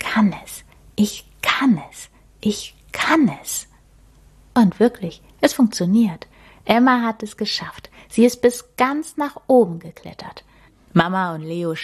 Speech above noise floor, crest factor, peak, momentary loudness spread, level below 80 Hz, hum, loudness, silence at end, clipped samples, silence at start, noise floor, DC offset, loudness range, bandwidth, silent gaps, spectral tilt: 32 dB; 18 dB; -2 dBFS; 18 LU; -52 dBFS; none; -19 LUFS; 0 s; under 0.1%; 0 s; -50 dBFS; under 0.1%; 3 LU; 14 kHz; none; -5 dB/octave